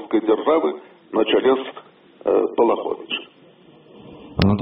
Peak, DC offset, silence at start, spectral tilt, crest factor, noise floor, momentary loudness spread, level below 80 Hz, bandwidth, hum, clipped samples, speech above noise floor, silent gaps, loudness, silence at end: 0 dBFS; under 0.1%; 0 s; -5 dB/octave; 22 dB; -49 dBFS; 11 LU; -48 dBFS; 5.4 kHz; none; under 0.1%; 30 dB; none; -20 LUFS; 0 s